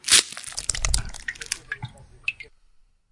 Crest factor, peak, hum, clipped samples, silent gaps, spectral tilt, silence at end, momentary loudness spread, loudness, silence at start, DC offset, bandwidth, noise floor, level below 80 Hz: 26 dB; 0 dBFS; none; under 0.1%; none; 0.5 dB/octave; 0.7 s; 20 LU; -25 LUFS; 0.05 s; under 0.1%; 11.5 kHz; -57 dBFS; -36 dBFS